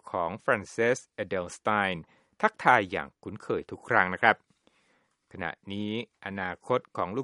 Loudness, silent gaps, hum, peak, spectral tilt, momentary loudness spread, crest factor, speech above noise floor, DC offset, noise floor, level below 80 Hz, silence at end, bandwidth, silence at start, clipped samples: -29 LUFS; none; none; -4 dBFS; -5 dB/octave; 14 LU; 26 dB; 41 dB; under 0.1%; -70 dBFS; -66 dBFS; 0 s; 11.5 kHz; 0.05 s; under 0.1%